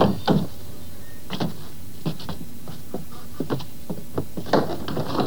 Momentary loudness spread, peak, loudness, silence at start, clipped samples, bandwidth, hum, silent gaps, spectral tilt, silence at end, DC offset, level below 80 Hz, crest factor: 17 LU; -4 dBFS; -28 LUFS; 0 s; under 0.1%; over 20 kHz; none; none; -6.5 dB/octave; 0 s; 5%; -48 dBFS; 22 dB